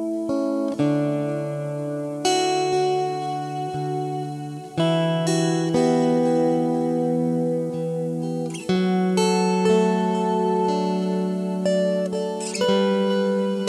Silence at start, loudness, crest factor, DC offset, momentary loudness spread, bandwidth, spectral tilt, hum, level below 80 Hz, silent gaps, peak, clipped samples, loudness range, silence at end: 0 s; -22 LUFS; 14 dB; under 0.1%; 8 LU; 12.5 kHz; -6 dB/octave; none; -66 dBFS; none; -8 dBFS; under 0.1%; 3 LU; 0 s